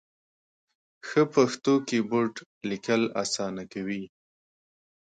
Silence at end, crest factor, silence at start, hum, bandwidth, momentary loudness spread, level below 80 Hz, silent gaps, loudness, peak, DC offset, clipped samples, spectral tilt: 1 s; 20 dB; 1.05 s; none; 9.4 kHz; 12 LU; -70 dBFS; 2.46-2.61 s; -27 LUFS; -8 dBFS; under 0.1%; under 0.1%; -4.5 dB/octave